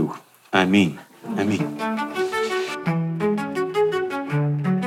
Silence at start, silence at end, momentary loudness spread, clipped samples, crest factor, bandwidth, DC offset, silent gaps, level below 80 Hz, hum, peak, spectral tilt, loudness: 0 s; 0 s; 7 LU; under 0.1%; 22 dB; 15.5 kHz; under 0.1%; none; -68 dBFS; none; -2 dBFS; -6.5 dB/octave; -23 LUFS